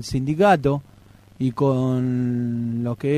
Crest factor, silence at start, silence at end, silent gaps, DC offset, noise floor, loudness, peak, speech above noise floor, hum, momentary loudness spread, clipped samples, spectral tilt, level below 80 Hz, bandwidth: 16 dB; 0 s; 0 s; none; under 0.1%; -49 dBFS; -22 LUFS; -6 dBFS; 29 dB; none; 9 LU; under 0.1%; -7.5 dB/octave; -48 dBFS; 13 kHz